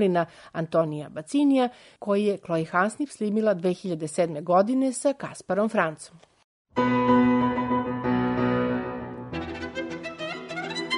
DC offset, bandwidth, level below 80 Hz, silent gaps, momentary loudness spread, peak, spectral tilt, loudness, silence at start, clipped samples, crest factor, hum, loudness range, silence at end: under 0.1%; 11 kHz; -56 dBFS; 6.44-6.65 s; 12 LU; -8 dBFS; -6 dB/octave; -26 LUFS; 0 s; under 0.1%; 18 dB; none; 2 LU; 0 s